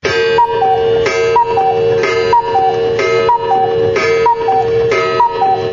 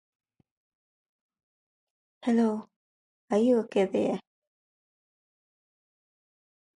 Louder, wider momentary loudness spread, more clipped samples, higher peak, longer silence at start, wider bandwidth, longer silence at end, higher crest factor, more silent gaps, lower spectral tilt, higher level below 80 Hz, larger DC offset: first, -12 LUFS vs -27 LUFS; second, 2 LU vs 11 LU; neither; first, -2 dBFS vs -14 dBFS; second, 0.05 s vs 2.25 s; second, 7.6 kHz vs 11 kHz; second, 0 s vs 2.55 s; second, 10 dB vs 18 dB; second, none vs 2.76-3.28 s; second, -4.5 dB/octave vs -7 dB/octave; first, -42 dBFS vs -76 dBFS; neither